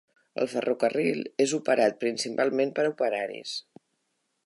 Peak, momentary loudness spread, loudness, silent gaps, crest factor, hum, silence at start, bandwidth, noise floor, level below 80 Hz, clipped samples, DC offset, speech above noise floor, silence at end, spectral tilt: -10 dBFS; 10 LU; -27 LUFS; none; 18 dB; none; 0.35 s; 11.5 kHz; -77 dBFS; -82 dBFS; under 0.1%; under 0.1%; 50 dB; 0.85 s; -4 dB/octave